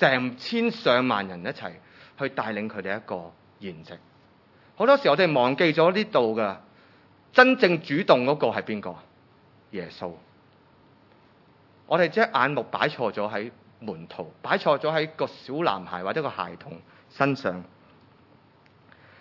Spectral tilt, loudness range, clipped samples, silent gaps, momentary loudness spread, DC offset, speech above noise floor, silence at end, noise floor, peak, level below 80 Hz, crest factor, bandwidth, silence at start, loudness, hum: -6.5 dB/octave; 11 LU; under 0.1%; none; 19 LU; under 0.1%; 33 dB; 1.55 s; -57 dBFS; 0 dBFS; -76 dBFS; 26 dB; 6 kHz; 0 s; -24 LUFS; none